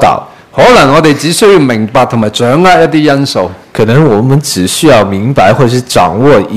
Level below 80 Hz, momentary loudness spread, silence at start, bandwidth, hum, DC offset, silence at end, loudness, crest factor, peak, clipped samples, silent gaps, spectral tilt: -36 dBFS; 6 LU; 0 s; 15.5 kHz; none; 2%; 0 s; -7 LUFS; 6 dB; 0 dBFS; 5%; none; -5.5 dB/octave